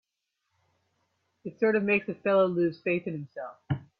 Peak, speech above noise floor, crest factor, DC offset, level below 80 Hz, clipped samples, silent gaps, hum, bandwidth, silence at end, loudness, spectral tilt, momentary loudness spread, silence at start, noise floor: -12 dBFS; 55 dB; 18 dB; under 0.1%; -66 dBFS; under 0.1%; none; none; 5.4 kHz; 0.15 s; -27 LUFS; -9.5 dB/octave; 17 LU; 1.45 s; -82 dBFS